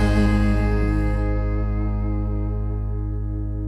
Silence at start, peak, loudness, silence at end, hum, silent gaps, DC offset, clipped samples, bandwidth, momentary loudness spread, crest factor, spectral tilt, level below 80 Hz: 0 s; -8 dBFS; -23 LUFS; 0 s; none; none; under 0.1%; under 0.1%; 9.2 kHz; 8 LU; 14 dB; -8.5 dB/octave; -24 dBFS